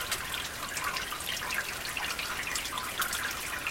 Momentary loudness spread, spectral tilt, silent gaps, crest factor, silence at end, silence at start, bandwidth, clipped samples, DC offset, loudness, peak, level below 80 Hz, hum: 3 LU; -0.5 dB/octave; none; 20 dB; 0 s; 0 s; 17 kHz; under 0.1%; under 0.1%; -32 LUFS; -14 dBFS; -54 dBFS; none